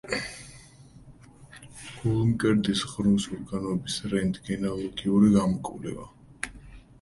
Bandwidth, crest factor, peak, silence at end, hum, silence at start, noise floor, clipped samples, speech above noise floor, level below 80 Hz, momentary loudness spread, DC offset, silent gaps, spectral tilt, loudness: 11.5 kHz; 18 dB; -8 dBFS; 0.25 s; none; 0.05 s; -51 dBFS; under 0.1%; 25 dB; -50 dBFS; 19 LU; under 0.1%; none; -6 dB/octave; -27 LUFS